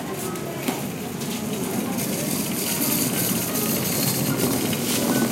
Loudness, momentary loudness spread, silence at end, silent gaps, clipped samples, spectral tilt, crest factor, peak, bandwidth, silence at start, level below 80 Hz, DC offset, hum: -23 LUFS; 8 LU; 0 s; none; under 0.1%; -3.5 dB/octave; 16 dB; -8 dBFS; 16 kHz; 0 s; -56 dBFS; under 0.1%; none